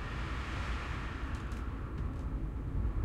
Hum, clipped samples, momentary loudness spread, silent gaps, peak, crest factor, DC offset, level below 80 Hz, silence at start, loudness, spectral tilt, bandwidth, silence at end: none; under 0.1%; 3 LU; none; -24 dBFS; 14 dB; under 0.1%; -38 dBFS; 0 s; -39 LUFS; -6.5 dB/octave; 10 kHz; 0 s